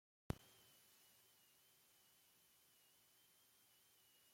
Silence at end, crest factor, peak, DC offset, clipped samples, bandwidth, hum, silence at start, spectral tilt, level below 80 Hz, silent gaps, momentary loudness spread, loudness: 0 s; 34 dB; -28 dBFS; under 0.1%; under 0.1%; 16.5 kHz; none; 0.3 s; -5 dB/octave; -72 dBFS; none; 16 LU; -54 LUFS